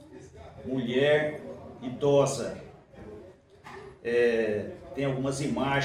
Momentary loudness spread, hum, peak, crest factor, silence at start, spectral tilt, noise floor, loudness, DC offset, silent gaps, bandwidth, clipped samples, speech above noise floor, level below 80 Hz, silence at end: 23 LU; none; -12 dBFS; 18 dB; 0 s; -5.5 dB/octave; -51 dBFS; -28 LUFS; under 0.1%; none; 13 kHz; under 0.1%; 24 dB; -58 dBFS; 0 s